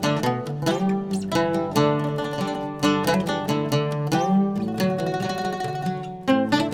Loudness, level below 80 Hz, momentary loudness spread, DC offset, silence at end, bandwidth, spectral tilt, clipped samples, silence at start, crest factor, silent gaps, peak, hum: -24 LUFS; -54 dBFS; 6 LU; under 0.1%; 0 s; 17 kHz; -6 dB/octave; under 0.1%; 0 s; 16 dB; none; -8 dBFS; none